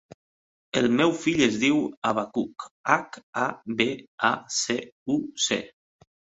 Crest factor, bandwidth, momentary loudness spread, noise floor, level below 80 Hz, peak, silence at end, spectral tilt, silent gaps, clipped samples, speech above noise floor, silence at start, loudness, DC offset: 24 dB; 8.4 kHz; 9 LU; under -90 dBFS; -64 dBFS; -2 dBFS; 0.7 s; -3.5 dB/octave; 1.97-2.02 s, 2.71-2.84 s, 3.23-3.33 s, 4.08-4.18 s, 4.92-5.06 s; under 0.1%; over 65 dB; 0.75 s; -25 LUFS; under 0.1%